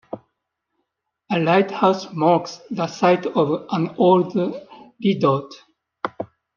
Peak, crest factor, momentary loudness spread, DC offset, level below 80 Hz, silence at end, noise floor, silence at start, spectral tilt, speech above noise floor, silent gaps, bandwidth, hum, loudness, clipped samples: -2 dBFS; 18 dB; 15 LU; under 0.1%; -70 dBFS; 0.3 s; -77 dBFS; 0.15 s; -7 dB/octave; 58 dB; none; 7.2 kHz; none; -20 LUFS; under 0.1%